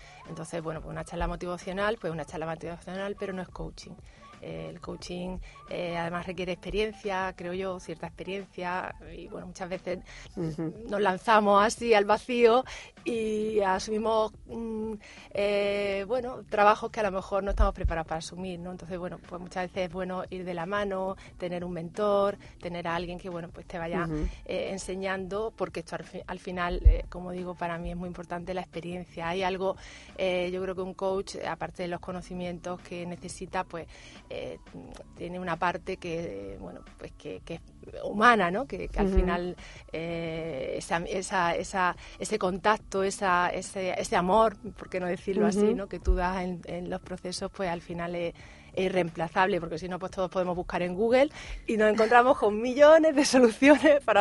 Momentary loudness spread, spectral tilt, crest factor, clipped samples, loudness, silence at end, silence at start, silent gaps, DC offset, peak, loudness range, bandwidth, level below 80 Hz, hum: 17 LU; -5 dB/octave; 24 dB; under 0.1%; -29 LUFS; 0 s; 0 s; none; under 0.1%; -6 dBFS; 11 LU; 11.5 kHz; -40 dBFS; none